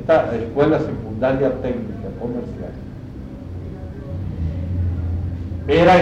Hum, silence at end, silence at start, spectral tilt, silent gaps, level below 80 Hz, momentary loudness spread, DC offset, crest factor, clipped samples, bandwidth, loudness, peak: none; 0 s; 0 s; -8 dB/octave; none; -34 dBFS; 15 LU; under 0.1%; 16 dB; under 0.1%; 8 kHz; -21 LUFS; -4 dBFS